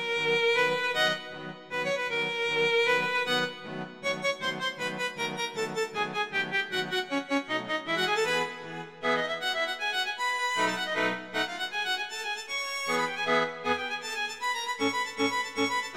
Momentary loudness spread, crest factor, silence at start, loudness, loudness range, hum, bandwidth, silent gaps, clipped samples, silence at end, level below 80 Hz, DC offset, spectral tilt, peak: 7 LU; 16 dB; 0 s; -28 LUFS; 3 LU; none; 16 kHz; none; under 0.1%; 0 s; -70 dBFS; 0.1%; -2.5 dB/octave; -14 dBFS